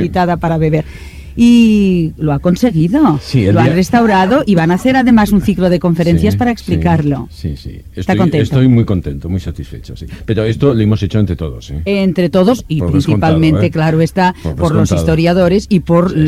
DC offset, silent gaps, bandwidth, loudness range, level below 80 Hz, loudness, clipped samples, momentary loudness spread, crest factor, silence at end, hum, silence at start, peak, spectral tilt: under 0.1%; none; 14.5 kHz; 5 LU; -30 dBFS; -12 LUFS; under 0.1%; 12 LU; 12 dB; 0 s; none; 0 s; 0 dBFS; -7.5 dB/octave